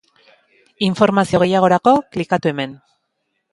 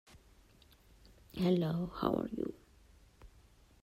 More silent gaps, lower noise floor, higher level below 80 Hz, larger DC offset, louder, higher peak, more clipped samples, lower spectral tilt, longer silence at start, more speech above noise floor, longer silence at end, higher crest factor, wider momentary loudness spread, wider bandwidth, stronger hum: neither; first, -72 dBFS vs -64 dBFS; first, -54 dBFS vs -60 dBFS; neither; first, -16 LUFS vs -35 LUFS; first, 0 dBFS vs -16 dBFS; neither; second, -6.5 dB/octave vs -8 dB/octave; first, 0.8 s vs 0.15 s; first, 56 dB vs 30 dB; first, 0.75 s vs 0.55 s; about the same, 18 dB vs 22 dB; second, 8 LU vs 11 LU; second, 11.5 kHz vs 15.5 kHz; neither